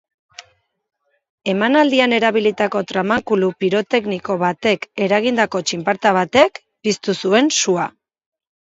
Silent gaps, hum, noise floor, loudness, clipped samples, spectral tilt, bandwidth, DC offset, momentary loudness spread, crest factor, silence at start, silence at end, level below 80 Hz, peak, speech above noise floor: 1.29-1.38 s; none; -55 dBFS; -17 LUFS; under 0.1%; -4 dB/octave; 8 kHz; under 0.1%; 7 LU; 18 dB; 0.4 s; 0.75 s; -60 dBFS; 0 dBFS; 38 dB